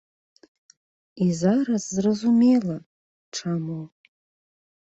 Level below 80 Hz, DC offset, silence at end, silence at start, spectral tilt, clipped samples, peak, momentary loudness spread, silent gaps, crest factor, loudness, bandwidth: -66 dBFS; under 0.1%; 1 s; 1.15 s; -6.5 dB/octave; under 0.1%; -8 dBFS; 17 LU; 2.86-3.32 s; 16 dB; -23 LUFS; 8 kHz